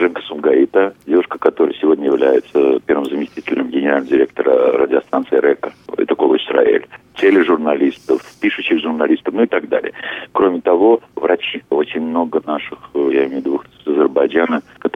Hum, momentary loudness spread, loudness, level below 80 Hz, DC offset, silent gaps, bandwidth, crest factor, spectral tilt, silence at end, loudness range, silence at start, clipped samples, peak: none; 8 LU; -16 LUFS; -60 dBFS; under 0.1%; none; 6.8 kHz; 16 dB; -6.5 dB/octave; 0.05 s; 2 LU; 0 s; under 0.1%; 0 dBFS